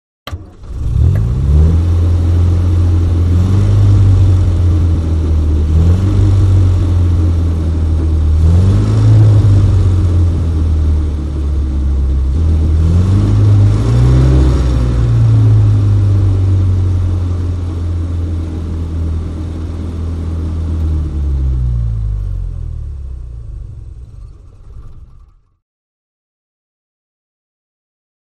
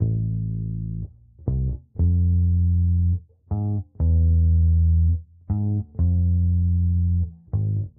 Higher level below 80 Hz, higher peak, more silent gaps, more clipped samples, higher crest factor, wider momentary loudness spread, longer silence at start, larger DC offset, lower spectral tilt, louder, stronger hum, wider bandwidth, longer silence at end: first, -16 dBFS vs -28 dBFS; first, -2 dBFS vs -8 dBFS; neither; neither; about the same, 10 dB vs 12 dB; about the same, 12 LU vs 10 LU; first, 0.25 s vs 0 s; neither; second, -9 dB/octave vs -17 dB/octave; first, -13 LUFS vs -23 LUFS; neither; first, 8 kHz vs 1 kHz; first, 3.15 s vs 0.1 s